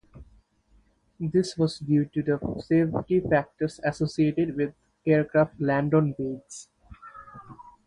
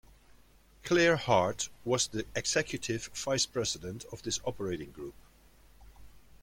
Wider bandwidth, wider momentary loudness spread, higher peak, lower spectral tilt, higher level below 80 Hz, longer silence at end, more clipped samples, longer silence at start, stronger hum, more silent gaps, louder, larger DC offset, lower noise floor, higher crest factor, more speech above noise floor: second, 11 kHz vs 16.5 kHz; first, 20 LU vs 16 LU; about the same, -10 dBFS vs -12 dBFS; first, -7.5 dB/octave vs -3.5 dB/octave; about the same, -54 dBFS vs -58 dBFS; about the same, 0.25 s vs 0.25 s; neither; second, 0.15 s vs 0.85 s; neither; neither; first, -26 LUFS vs -31 LUFS; neither; about the same, -63 dBFS vs -60 dBFS; about the same, 18 dB vs 22 dB; first, 38 dB vs 28 dB